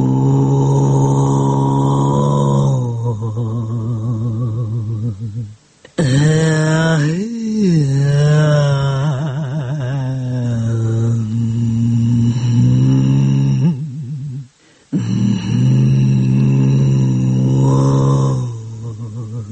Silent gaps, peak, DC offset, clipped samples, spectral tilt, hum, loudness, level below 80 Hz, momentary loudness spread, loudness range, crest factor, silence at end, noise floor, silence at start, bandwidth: none; -2 dBFS; under 0.1%; under 0.1%; -7.5 dB/octave; none; -15 LUFS; -42 dBFS; 11 LU; 4 LU; 12 dB; 0 s; -45 dBFS; 0 s; 8.8 kHz